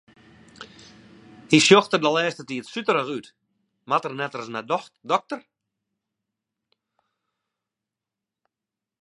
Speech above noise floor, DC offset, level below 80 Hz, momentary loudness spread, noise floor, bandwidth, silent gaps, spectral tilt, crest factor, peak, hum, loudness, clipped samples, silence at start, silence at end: 66 dB; under 0.1%; -74 dBFS; 21 LU; -88 dBFS; 11.5 kHz; none; -4 dB/octave; 26 dB; -2 dBFS; none; -22 LUFS; under 0.1%; 0.6 s; 3.65 s